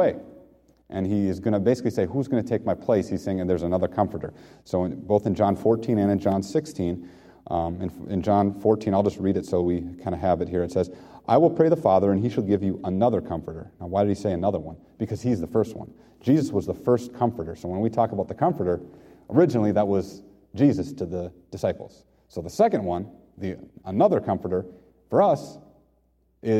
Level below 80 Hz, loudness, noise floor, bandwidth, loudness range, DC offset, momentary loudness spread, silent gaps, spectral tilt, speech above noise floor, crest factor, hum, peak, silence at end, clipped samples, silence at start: -52 dBFS; -24 LUFS; -65 dBFS; 14.5 kHz; 4 LU; under 0.1%; 14 LU; none; -8 dB/octave; 41 dB; 20 dB; none; -4 dBFS; 0 s; under 0.1%; 0 s